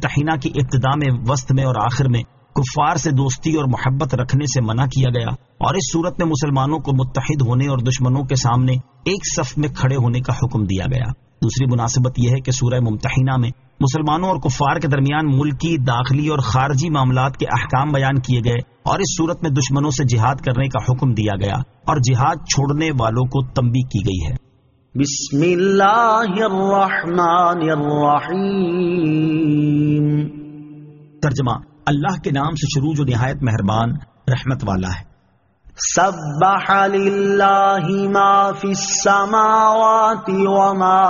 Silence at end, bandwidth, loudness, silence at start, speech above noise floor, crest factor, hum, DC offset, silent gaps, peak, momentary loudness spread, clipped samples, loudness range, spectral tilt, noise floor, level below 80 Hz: 0 s; 7.4 kHz; -17 LUFS; 0 s; 42 dB; 14 dB; none; under 0.1%; none; -2 dBFS; 8 LU; under 0.1%; 4 LU; -6 dB/octave; -58 dBFS; -40 dBFS